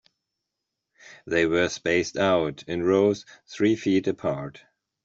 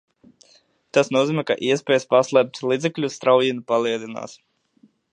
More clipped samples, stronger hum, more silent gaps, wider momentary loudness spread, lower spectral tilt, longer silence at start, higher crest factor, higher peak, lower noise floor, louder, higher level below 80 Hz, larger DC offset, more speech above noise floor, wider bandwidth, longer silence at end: neither; neither; neither; about the same, 10 LU vs 9 LU; about the same, -5.5 dB/octave vs -5 dB/octave; about the same, 1.05 s vs 0.95 s; about the same, 18 dB vs 20 dB; second, -8 dBFS vs -2 dBFS; first, -84 dBFS vs -58 dBFS; second, -24 LUFS vs -20 LUFS; first, -60 dBFS vs -72 dBFS; neither; first, 60 dB vs 38 dB; second, 7.8 kHz vs 9.8 kHz; second, 0.55 s vs 0.8 s